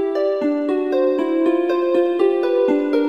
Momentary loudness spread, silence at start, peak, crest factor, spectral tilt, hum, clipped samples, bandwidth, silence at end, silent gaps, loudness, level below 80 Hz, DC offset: 3 LU; 0 s; -6 dBFS; 12 dB; -6 dB/octave; none; under 0.1%; 6.2 kHz; 0 s; none; -18 LUFS; -74 dBFS; 0.2%